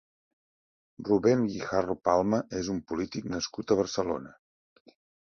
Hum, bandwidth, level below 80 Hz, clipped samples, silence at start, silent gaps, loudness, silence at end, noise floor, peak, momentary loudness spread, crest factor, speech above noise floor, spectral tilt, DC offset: none; 7.2 kHz; -58 dBFS; under 0.1%; 1 s; none; -29 LUFS; 1.05 s; under -90 dBFS; -10 dBFS; 9 LU; 22 dB; over 62 dB; -5.5 dB/octave; under 0.1%